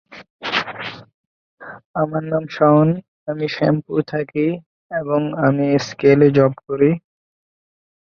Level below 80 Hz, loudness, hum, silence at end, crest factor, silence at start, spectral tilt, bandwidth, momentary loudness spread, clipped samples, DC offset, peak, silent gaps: -58 dBFS; -18 LUFS; none; 1.1 s; 18 dB; 0.1 s; -7.5 dB/octave; 7 kHz; 15 LU; under 0.1%; under 0.1%; -2 dBFS; 0.30-0.39 s, 1.14-1.57 s, 1.85-1.94 s, 3.08-3.26 s, 4.66-4.89 s